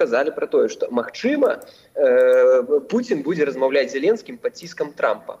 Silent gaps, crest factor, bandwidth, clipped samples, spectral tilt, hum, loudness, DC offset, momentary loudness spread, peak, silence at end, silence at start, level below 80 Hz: none; 14 dB; 9 kHz; under 0.1%; -5 dB/octave; none; -20 LUFS; under 0.1%; 14 LU; -6 dBFS; 0.05 s; 0 s; -70 dBFS